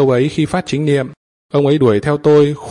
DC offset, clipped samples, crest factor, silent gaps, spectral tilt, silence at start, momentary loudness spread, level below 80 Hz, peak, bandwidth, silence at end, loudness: under 0.1%; under 0.1%; 12 dB; 1.17-1.49 s; -7 dB/octave; 0 s; 7 LU; -48 dBFS; -2 dBFS; 11 kHz; 0 s; -14 LUFS